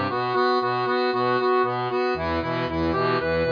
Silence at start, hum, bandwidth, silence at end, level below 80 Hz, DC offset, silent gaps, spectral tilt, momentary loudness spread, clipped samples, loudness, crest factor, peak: 0 s; none; 5.2 kHz; 0 s; -46 dBFS; under 0.1%; none; -7.5 dB/octave; 4 LU; under 0.1%; -23 LUFS; 12 dB; -10 dBFS